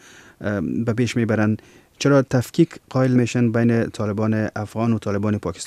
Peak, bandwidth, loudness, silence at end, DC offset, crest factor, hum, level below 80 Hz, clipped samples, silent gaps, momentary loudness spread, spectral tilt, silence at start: -4 dBFS; 13.5 kHz; -21 LUFS; 0 s; under 0.1%; 16 dB; none; -54 dBFS; under 0.1%; none; 6 LU; -7 dB/octave; 0.4 s